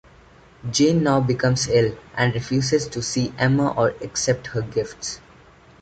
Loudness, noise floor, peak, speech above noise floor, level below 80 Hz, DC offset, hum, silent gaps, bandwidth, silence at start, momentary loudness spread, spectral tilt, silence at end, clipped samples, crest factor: -21 LUFS; -50 dBFS; -4 dBFS; 29 dB; -48 dBFS; under 0.1%; none; none; 9.2 kHz; 0.65 s; 9 LU; -5 dB/octave; 0.65 s; under 0.1%; 18 dB